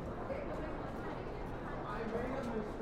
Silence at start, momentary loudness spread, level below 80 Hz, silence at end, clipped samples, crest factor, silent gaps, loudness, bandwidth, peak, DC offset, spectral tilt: 0 s; 4 LU; -50 dBFS; 0 s; under 0.1%; 14 dB; none; -42 LUFS; 15 kHz; -28 dBFS; under 0.1%; -7.5 dB/octave